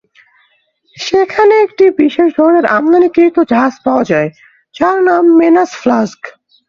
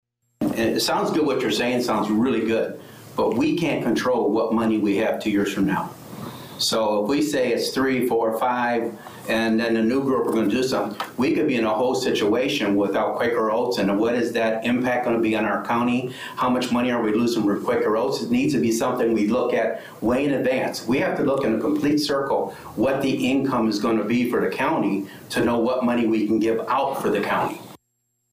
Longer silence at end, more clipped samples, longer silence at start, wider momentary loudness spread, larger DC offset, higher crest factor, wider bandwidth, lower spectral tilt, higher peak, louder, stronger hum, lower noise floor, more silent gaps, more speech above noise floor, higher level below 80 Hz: second, 0.4 s vs 0.55 s; neither; first, 0.95 s vs 0.4 s; first, 7 LU vs 4 LU; neither; about the same, 10 dB vs 8 dB; second, 7.2 kHz vs 15.5 kHz; about the same, -6 dB/octave vs -5 dB/octave; first, 0 dBFS vs -12 dBFS; first, -10 LUFS vs -22 LUFS; neither; second, -56 dBFS vs -73 dBFS; neither; second, 46 dB vs 52 dB; about the same, -52 dBFS vs -56 dBFS